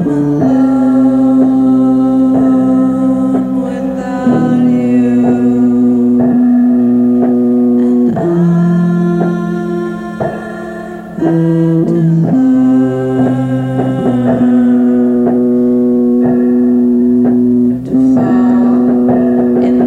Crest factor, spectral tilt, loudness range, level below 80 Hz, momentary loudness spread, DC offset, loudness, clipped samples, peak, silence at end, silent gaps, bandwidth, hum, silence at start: 10 dB; -10 dB/octave; 3 LU; -44 dBFS; 7 LU; under 0.1%; -10 LUFS; under 0.1%; 0 dBFS; 0 s; none; 4.1 kHz; none; 0 s